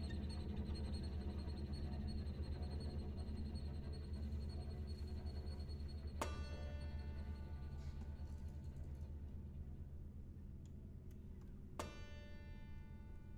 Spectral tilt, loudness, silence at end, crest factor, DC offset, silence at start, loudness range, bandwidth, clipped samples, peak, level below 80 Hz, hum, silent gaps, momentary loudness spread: -7 dB/octave; -50 LUFS; 0 s; 20 dB; under 0.1%; 0 s; 7 LU; 11 kHz; under 0.1%; -28 dBFS; -50 dBFS; none; none; 9 LU